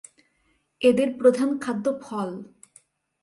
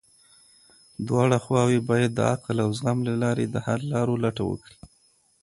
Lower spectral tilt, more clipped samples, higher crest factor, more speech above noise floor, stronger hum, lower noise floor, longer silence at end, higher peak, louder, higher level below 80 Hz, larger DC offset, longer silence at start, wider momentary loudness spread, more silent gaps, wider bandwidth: about the same, -5.5 dB/octave vs -6.5 dB/octave; neither; about the same, 20 dB vs 20 dB; first, 46 dB vs 39 dB; neither; first, -69 dBFS vs -63 dBFS; first, 0.8 s vs 0.55 s; about the same, -6 dBFS vs -6 dBFS; about the same, -23 LUFS vs -24 LUFS; second, -68 dBFS vs -56 dBFS; neither; second, 0.8 s vs 1 s; about the same, 11 LU vs 9 LU; neither; about the same, 11.5 kHz vs 11.5 kHz